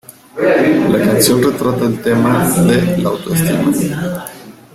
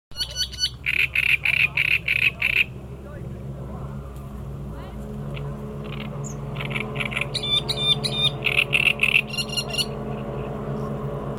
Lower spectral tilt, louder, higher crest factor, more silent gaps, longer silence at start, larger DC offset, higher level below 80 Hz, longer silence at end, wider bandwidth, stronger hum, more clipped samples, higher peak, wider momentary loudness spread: first, -5.5 dB/octave vs -3.5 dB/octave; first, -13 LUFS vs -22 LUFS; second, 14 dB vs 22 dB; neither; about the same, 0.1 s vs 0.1 s; neither; about the same, -44 dBFS vs -42 dBFS; first, 0.25 s vs 0 s; about the same, 16.5 kHz vs 16.5 kHz; neither; neither; first, 0 dBFS vs -4 dBFS; second, 9 LU vs 17 LU